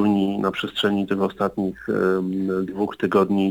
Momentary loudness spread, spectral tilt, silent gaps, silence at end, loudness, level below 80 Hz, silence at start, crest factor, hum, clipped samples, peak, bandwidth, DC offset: 5 LU; -7 dB/octave; none; 0 s; -23 LUFS; -56 dBFS; 0 s; 16 dB; none; under 0.1%; -6 dBFS; 19 kHz; under 0.1%